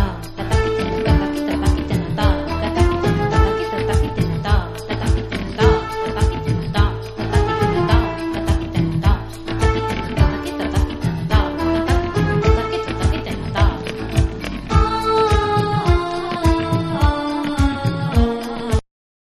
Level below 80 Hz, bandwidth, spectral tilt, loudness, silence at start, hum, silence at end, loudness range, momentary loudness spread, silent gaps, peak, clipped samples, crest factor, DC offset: -24 dBFS; 13 kHz; -6.5 dB/octave; -19 LUFS; 0 s; none; 0.5 s; 2 LU; 6 LU; none; -2 dBFS; under 0.1%; 16 dB; under 0.1%